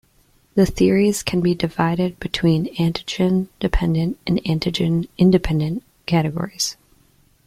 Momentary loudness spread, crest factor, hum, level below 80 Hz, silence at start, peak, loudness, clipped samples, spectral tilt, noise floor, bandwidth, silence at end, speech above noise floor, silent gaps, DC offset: 7 LU; 18 dB; none; -34 dBFS; 0.55 s; -2 dBFS; -20 LUFS; under 0.1%; -6 dB/octave; -58 dBFS; 15 kHz; 0.75 s; 39 dB; none; under 0.1%